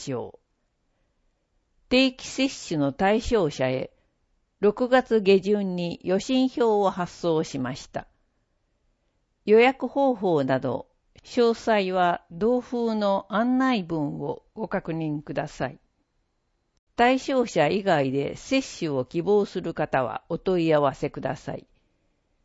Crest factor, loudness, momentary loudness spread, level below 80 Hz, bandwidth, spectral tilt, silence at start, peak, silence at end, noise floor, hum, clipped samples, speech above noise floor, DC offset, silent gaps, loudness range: 20 dB; -24 LUFS; 12 LU; -52 dBFS; 8 kHz; -5.5 dB/octave; 0 s; -6 dBFS; 0.85 s; -73 dBFS; none; under 0.1%; 49 dB; under 0.1%; 16.79-16.87 s; 4 LU